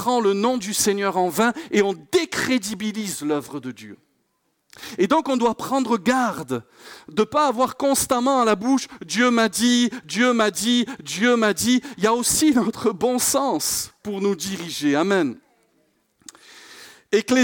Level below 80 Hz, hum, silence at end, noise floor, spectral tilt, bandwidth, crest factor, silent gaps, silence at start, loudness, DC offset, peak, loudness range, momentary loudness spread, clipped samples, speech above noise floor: -58 dBFS; none; 0 s; -70 dBFS; -3 dB/octave; 18 kHz; 14 dB; none; 0 s; -21 LUFS; under 0.1%; -8 dBFS; 6 LU; 9 LU; under 0.1%; 49 dB